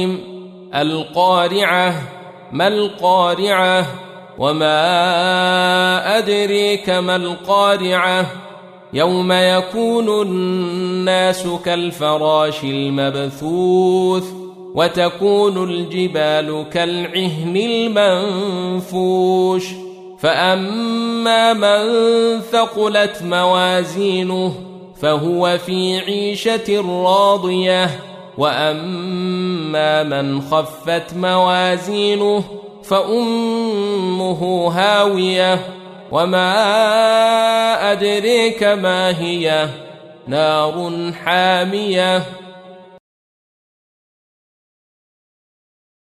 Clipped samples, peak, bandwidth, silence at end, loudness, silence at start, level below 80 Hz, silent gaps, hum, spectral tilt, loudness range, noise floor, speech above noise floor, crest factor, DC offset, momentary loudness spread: under 0.1%; -2 dBFS; 15 kHz; 3.2 s; -16 LUFS; 0 s; -58 dBFS; none; none; -5 dB/octave; 3 LU; -39 dBFS; 23 dB; 16 dB; under 0.1%; 8 LU